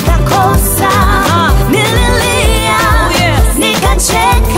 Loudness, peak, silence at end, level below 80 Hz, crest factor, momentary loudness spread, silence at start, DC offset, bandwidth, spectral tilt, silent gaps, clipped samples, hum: -9 LUFS; 0 dBFS; 0 s; -14 dBFS; 8 dB; 1 LU; 0 s; under 0.1%; 16.5 kHz; -4 dB/octave; none; under 0.1%; none